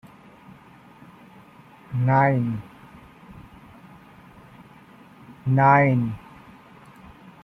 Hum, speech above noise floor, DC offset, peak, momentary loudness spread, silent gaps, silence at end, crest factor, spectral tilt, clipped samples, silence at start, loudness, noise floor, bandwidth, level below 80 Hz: none; 30 dB; under 0.1%; -4 dBFS; 27 LU; none; 1.25 s; 22 dB; -10 dB/octave; under 0.1%; 1.9 s; -21 LUFS; -49 dBFS; 5.8 kHz; -58 dBFS